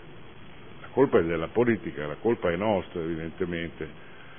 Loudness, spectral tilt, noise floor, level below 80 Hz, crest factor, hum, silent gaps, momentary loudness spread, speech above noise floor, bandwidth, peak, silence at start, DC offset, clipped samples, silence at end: -27 LUFS; -11 dB/octave; -47 dBFS; -54 dBFS; 20 dB; none; none; 24 LU; 21 dB; 3.6 kHz; -8 dBFS; 0 s; 0.5%; under 0.1%; 0 s